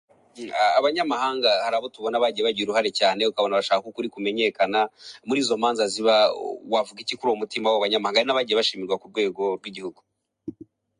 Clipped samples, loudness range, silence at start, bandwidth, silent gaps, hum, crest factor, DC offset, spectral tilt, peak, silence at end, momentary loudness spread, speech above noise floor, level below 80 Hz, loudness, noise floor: under 0.1%; 2 LU; 0.35 s; 11 kHz; none; none; 18 dB; under 0.1%; -3 dB/octave; -6 dBFS; 0.5 s; 12 LU; 21 dB; -72 dBFS; -23 LUFS; -44 dBFS